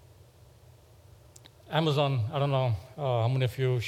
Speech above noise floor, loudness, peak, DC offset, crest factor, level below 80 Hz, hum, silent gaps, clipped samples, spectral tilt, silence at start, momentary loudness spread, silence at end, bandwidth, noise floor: 28 dB; -28 LUFS; -10 dBFS; under 0.1%; 20 dB; -64 dBFS; none; none; under 0.1%; -7 dB/octave; 1.65 s; 5 LU; 0 s; 13.5 kHz; -56 dBFS